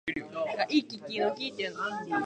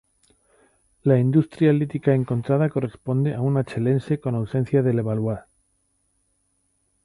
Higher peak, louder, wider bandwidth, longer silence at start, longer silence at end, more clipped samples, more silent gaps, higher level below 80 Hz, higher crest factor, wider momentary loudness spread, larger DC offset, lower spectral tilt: second, -12 dBFS vs -6 dBFS; second, -32 LUFS vs -22 LUFS; second, 9 kHz vs 10.5 kHz; second, 0.05 s vs 1.05 s; second, 0 s vs 1.65 s; neither; neither; second, -70 dBFS vs -56 dBFS; about the same, 20 dB vs 18 dB; about the same, 7 LU vs 7 LU; neither; second, -4.5 dB/octave vs -10 dB/octave